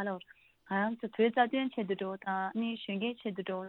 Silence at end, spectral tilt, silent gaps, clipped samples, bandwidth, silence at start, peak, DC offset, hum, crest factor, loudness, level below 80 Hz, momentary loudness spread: 0 s; -8.5 dB/octave; none; under 0.1%; 4.3 kHz; 0 s; -14 dBFS; under 0.1%; none; 20 dB; -34 LUFS; -80 dBFS; 8 LU